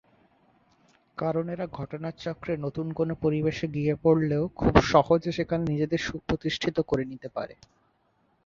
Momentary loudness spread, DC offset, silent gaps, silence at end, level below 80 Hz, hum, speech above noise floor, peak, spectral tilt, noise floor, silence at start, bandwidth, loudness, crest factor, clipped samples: 13 LU; under 0.1%; none; 0.9 s; -46 dBFS; none; 42 dB; -2 dBFS; -7 dB/octave; -69 dBFS; 1.15 s; 7.4 kHz; -27 LUFS; 24 dB; under 0.1%